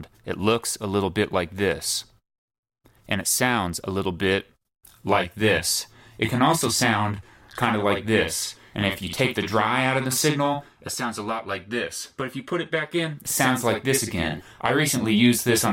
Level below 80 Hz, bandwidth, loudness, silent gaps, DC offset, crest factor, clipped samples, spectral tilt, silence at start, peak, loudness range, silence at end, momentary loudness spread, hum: -52 dBFS; 16.5 kHz; -23 LUFS; 2.38-2.48 s, 2.58-2.63 s; under 0.1%; 18 dB; under 0.1%; -3.5 dB/octave; 0 s; -6 dBFS; 3 LU; 0 s; 9 LU; none